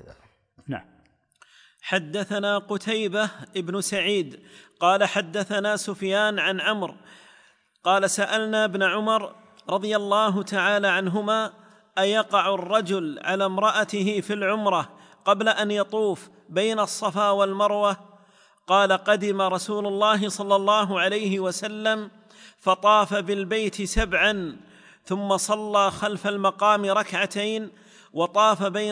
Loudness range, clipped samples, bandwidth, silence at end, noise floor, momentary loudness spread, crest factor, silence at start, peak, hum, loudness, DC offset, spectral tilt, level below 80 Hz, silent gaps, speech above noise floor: 2 LU; under 0.1%; 10.5 kHz; 0 s; -59 dBFS; 9 LU; 18 dB; 0.05 s; -6 dBFS; none; -23 LUFS; under 0.1%; -3.5 dB/octave; -48 dBFS; none; 36 dB